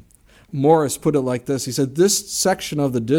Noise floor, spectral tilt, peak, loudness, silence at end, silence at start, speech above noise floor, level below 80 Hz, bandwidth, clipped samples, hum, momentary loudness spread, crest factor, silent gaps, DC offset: -52 dBFS; -4.5 dB/octave; -2 dBFS; -19 LUFS; 0 s; 0.55 s; 33 dB; -54 dBFS; 18 kHz; under 0.1%; none; 7 LU; 16 dB; none; under 0.1%